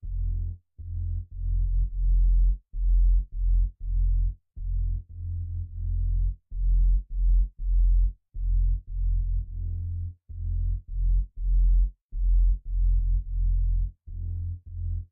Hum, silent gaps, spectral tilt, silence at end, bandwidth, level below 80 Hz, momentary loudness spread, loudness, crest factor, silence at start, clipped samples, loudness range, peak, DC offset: none; 12.01-12.09 s; -13.5 dB/octave; 0.05 s; 0.4 kHz; -24 dBFS; 10 LU; -30 LUFS; 10 dB; 0.05 s; under 0.1%; 3 LU; -16 dBFS; under 0.1%